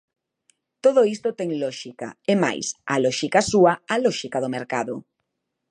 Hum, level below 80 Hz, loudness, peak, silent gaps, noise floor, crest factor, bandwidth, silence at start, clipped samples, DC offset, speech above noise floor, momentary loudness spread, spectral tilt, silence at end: none; -60 dBFS; -22 LUFS; -4 dBFS; none; -79 dBFS; 20 dB; 11 kHz; 0.85 s; under 0.1%; under 0.1%; 57 dB; 12 LU; -4.5 dB/octave; 0.7 s